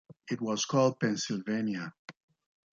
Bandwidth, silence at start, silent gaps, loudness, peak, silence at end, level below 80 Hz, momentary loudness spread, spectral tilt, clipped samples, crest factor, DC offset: 7.6 kHz; 0.1 s; 1.99-2.08 s; -31 LUFS; -14 dBFS; 0.6 s; -76 dBFS; 12 LU; -4.5 dB/octave; under 0.1%; 18 dB; under 0.1%